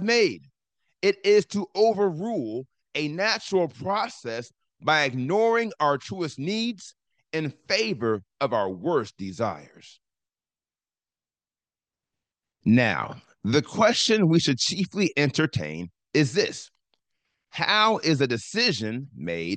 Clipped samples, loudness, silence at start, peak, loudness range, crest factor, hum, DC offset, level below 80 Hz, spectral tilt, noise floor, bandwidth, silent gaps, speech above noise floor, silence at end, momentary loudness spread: under 0.1%; -24 LUFS; 0 s; -6 dBFS; 7 LU; 18 dB; none; under 0.1%; -68 dBFS; -4.5 dB/octave; under -90 dBFS; 9.8 kHz; none; over 66 dB; 0 s; 13 LU